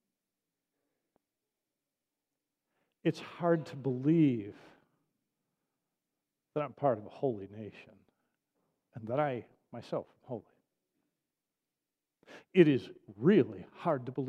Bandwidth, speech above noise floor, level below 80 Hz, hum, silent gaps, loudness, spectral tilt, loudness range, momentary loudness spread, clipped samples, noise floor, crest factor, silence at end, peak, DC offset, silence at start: 8.4 kHz; over 58 dB; -82 dBFS; none; none; -32 LUFS; -8.5 dB/octave; 9 LU; 20 LU; under 0.1%; under -90 dBFS; 26 dB; 0 s; -10 dBFS; under 0.1%; 3.05 s